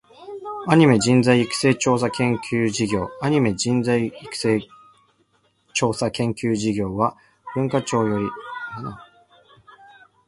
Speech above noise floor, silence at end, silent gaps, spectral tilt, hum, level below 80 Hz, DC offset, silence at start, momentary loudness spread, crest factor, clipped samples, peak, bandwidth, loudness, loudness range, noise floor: 44 dB; 1.25 s; none; -5.5 dB/octave; none; -54 dBFS; under 0.1%; 0.2 s; 15 LU; 20 dB; under 0.1%; -2 dBFS; 11.5 kHz; -21 LUFS; 6 LU; -64 dBFS